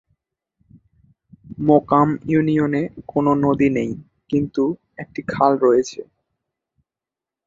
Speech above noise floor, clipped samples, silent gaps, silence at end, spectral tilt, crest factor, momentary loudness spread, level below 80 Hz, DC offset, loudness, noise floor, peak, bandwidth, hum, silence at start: 70 dB; under 0.1%; none; 1.45 s; -7.5 dB/octave; 20 dB; 15 LU; -54 dBFS; under 0.1%; -19 LUFS; -88 dBFS; -2 dBFS; 7.6 kHz; none; 1.5 s